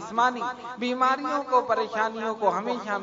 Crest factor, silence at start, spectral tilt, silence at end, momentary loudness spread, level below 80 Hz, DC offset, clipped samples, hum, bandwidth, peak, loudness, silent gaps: 18 dB; 0 s; -4 dB/octave; 0 s; 7 LU; -72 dBFS; under 0.1%; under 0.1%; 50 Hz at -65 dBFS; 7.8 kHz; -8 dBFS; -26 LUFS; none